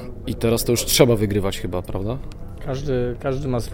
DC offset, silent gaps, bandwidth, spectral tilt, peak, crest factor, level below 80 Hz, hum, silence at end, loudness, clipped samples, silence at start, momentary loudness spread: under 0.1%; none; 17 kHz; -5 dB/octave; 0 dBFS; 20 dB; -32 dBFS; none; 0 s; -21 LUFS; under 0.1%; 0 s; 15 LU